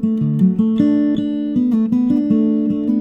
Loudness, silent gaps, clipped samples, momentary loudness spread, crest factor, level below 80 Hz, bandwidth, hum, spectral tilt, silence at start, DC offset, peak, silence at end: -16 LUFS; none; under 0.1%; 3 LU; 14 dB; -52 dBFS; 5.6 kHz; none; -10.5 dB/octave; 0 s; under 0.1%; -2 dBFS; 0 s